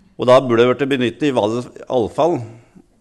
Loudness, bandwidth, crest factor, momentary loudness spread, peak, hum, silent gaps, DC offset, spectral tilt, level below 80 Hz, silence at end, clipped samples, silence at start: -17 LUFS; 12 kHz; 14 dB; 11 LU; -2 dBFS; none; none; under 0.1%; -6.5 dB/octave; -56 dBFS; 0.45 s; under 0.1%; 0.2 s